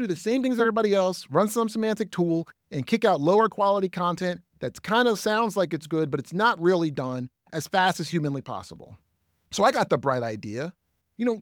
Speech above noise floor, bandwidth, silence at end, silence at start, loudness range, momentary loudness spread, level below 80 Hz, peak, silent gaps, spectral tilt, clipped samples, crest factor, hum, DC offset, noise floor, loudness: 35 dB; 19.5 kHz; 0 s; 0 s; 3 LU; 13 LU; -66 dBFS; -8 dBFS; none; -5.5 dB/octave; under 0.1%; 18 dB; none; under 0.1%; -60 dBFS; -25 LUFS